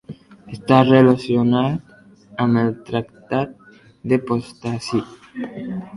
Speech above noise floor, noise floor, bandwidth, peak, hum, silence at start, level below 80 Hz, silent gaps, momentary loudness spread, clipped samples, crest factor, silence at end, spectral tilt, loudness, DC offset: 24 dB; -42 dBFS; 11 kHz; 0 dBFS; none; 0.1 s; -56 dBFS; none; 19 LU; under 0.1%; 18 dB; 0 s; -7.5 dB/octave; -19 LUFS; under 0.1%